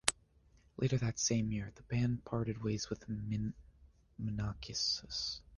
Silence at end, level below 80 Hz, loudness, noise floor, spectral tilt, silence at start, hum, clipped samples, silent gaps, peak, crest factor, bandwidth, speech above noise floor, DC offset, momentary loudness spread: 0 s; -56 dBFS; -37 LUFS; -67 dBFS; -4 dB/octave; 0.05 s; none; under 0.1%; none; -6 dBFS; 32 dB; 10 kHz; 30 dB; under 0.1%; 9 LU